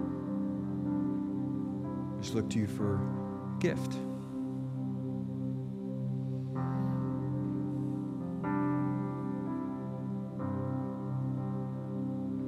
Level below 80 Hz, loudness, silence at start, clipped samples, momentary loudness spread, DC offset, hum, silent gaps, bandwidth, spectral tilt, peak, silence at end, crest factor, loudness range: -64 dBFS; -35 LUFS; 0 s; under 0.1%; 5 LU; under 0.1%; none; none; 11.5 kHz; -8 dB/octave; -18 dBFS; 0 s; 16 dB; 2 LU